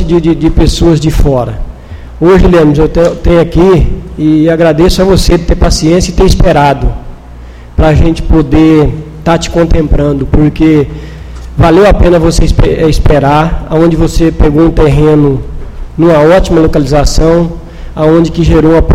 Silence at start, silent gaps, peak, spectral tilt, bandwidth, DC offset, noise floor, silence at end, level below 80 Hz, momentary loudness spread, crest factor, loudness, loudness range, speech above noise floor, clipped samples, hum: 0 s; none; 0 dBFS; -6.5 dB/octave; 15 kHz; under 0.1%; -27 dBFS; 0 s; -12 dBFS; 11 LU; 6 dB; -7 LUFS; 2 LU; 21 dB; 2%; none